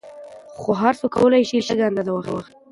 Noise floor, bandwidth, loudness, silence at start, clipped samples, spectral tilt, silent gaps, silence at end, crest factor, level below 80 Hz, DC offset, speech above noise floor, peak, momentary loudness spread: -40 dBFS; 11.5 kHz; -20 LUFS; 0.05 s; under 0.1%; -6 dB/octave; none; 0.3 s; 18 dB; -56 dBFS; under 0.1%; 20 dB; -4 dBFS; 21 LU